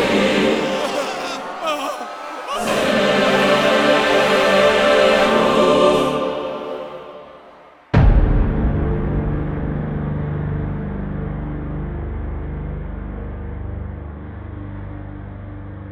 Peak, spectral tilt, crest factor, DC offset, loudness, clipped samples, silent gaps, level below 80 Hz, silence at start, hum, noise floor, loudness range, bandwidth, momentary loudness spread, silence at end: -2 dBFS; -5.5 dB/octave; 16 dB; under 0.1%; -18 LUFS; under 0.1%; none; -26 dBFS; 0 s; none; -44 dBFS; 15 LU; 16 kHz; 19 LU; 0 s